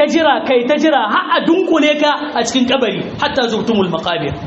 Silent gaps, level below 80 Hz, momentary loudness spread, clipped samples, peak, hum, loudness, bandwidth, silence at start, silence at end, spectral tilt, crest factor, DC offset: none; -48 dBFS; 5 LU; under 0.1%; -2 dBFS; none; -14 LUFS; 8 kHz; 0 s; 0 s; -2.5 dB/octave; 12 dB; under 0.1%